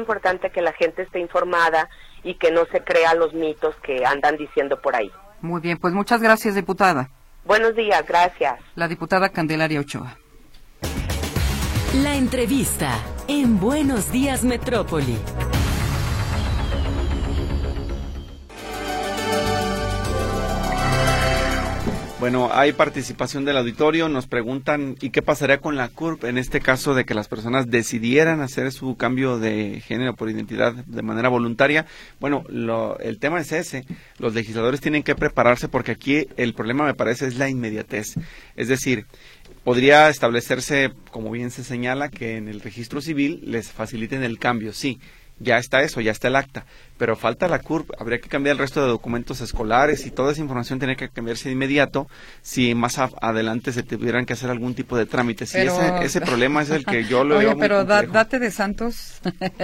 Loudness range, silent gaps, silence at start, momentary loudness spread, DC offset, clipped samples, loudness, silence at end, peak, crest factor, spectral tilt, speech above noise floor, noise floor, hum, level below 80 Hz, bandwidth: 5 LU; none; 0 s; 11 LU; under 0.1%; under 0.1%; -21 LUFS; 0 s; 0 dBFS; 20 dB; -5 dB/octave; 24 dB; -45 dBFS; none; -34 dBFS; 16.5 kHz